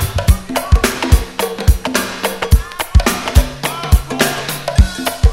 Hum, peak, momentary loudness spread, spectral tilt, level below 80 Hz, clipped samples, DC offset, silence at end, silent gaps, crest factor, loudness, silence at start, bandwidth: none; 0 dBFS; 6 LU; -4.5 dB/octave; -16 dBFS; 0.4%; under 0.1%; 0 s; none; 14 dB; -16 LUFS; 0 s; 16.5 kHz